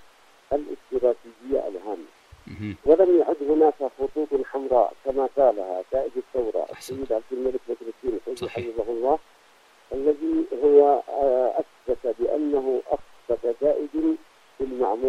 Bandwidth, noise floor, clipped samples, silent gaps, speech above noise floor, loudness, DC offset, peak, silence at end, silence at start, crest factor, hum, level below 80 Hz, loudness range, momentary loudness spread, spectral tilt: 12.5 kHz; -56 dBFS; under 0.1%; none; 32 dB; -24 LUFS; under 0.1%; -6 dBFS; 0 s; 0.5 s; 18 dB; none; -52 dBFS; 6 LU; 13 LU; -7 dB/octave